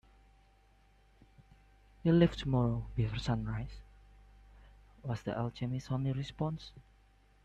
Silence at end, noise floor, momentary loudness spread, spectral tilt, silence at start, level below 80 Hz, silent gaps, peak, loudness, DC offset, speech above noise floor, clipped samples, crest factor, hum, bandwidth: 0.65 s; -65 dBFS; 18 LU; -8 dB/octave; 1.4 s; -52 dBFS; none; -14 dBFS; -34 LUFS; under 0.1%; 32 dB; under 0.1%; 22 dB; 50 Hz at -50 dBFS; 8.4 kHz